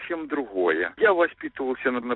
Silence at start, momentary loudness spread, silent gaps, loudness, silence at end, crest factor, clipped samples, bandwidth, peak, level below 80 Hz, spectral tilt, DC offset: 0 s; 9 LU; none; -24 LUFS; 0 s; 16 dB; under 0.1%; 4.1 kHz; -8 dBFS; -64 dBFS; -8 dB/octave; under 0.1%